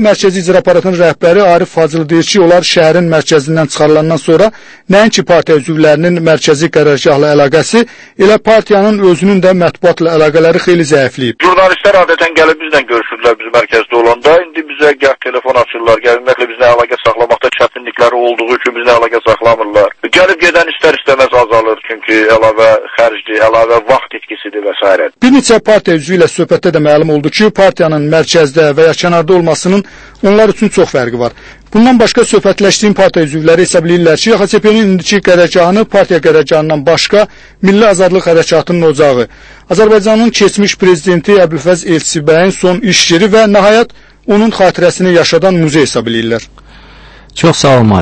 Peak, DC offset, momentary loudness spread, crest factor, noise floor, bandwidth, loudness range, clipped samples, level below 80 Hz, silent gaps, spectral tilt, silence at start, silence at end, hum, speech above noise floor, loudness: 0 dBFS; under 0.1%; 5 LU; 8 dB; -35 dBFS; 11 kHz; 2 LU; 2%; -40 dBFS; none; -5 dB/octave; 0 s; 0 s; none; 27 dB; -8 LUFS